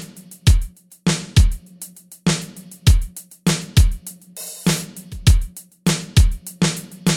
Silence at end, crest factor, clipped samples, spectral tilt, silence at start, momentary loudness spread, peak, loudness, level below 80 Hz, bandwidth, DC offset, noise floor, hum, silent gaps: 0 s; 16 dB; under 0.1%; -4.5 dB/octave; 0 s; 17 LU; -2 dBFS; -20 LUFS; -22 dBFS; 17 kHz; under 0.1%; -40 dBFS; none; none